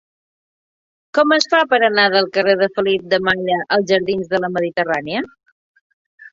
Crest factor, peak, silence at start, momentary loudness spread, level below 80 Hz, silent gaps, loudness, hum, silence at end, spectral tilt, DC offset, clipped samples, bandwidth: 18 dB; 0 dBFS; 1.15 s; 7 LU; -58 dBFS; 5.52-5.74 s, 5.81-6.18 s; -16 LUFS; none; 0.05 s; -4.5 dB/octave; under 0.1%; under 0.1%; 7.8 kHz